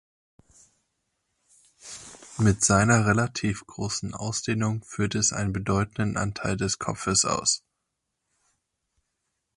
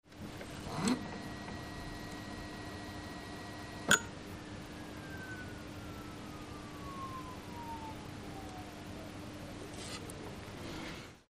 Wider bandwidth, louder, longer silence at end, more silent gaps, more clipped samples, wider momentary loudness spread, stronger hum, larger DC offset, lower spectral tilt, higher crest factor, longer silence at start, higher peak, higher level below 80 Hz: second, 11.5 kHz vs 15 kHz; first, -25 LUFS vs -41 LUFS; first, 2 s vs 0.05 s; neither; neither; about the same, 11 LU vs 11 LU; neither; neither; about the same, -4 dB/octave vs -3.5 dB/octave; second, 20 dB vs 32 dB; first, 1.85 s vs 0.05 s; about the same, -8 dBFS vs -10 dBFS; first, -48 dBFS vs -58 dBFS